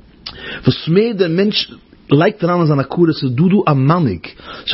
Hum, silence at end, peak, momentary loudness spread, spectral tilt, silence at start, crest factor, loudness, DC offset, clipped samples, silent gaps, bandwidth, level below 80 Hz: none; 0 s; 0 dBFS; 14 LU; -10 dB/octave; 0.25 s; 14 dB; -15 LUFS; under 0.1%; under 0.1%; none; 5.8 kHz; -48 dBFS